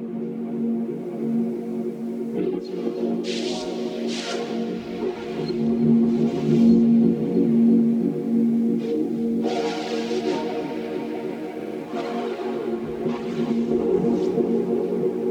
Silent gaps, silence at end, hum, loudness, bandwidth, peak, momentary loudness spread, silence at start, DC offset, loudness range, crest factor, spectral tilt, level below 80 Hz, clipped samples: none; 0 s; none; -23 LUFS; 8.8 kHz; -6 dBFS; 11 LU; 0 s; under 0.1%; 8 LU; 16 dB; -7 dB/octave; -58 dBFS; under 0.1%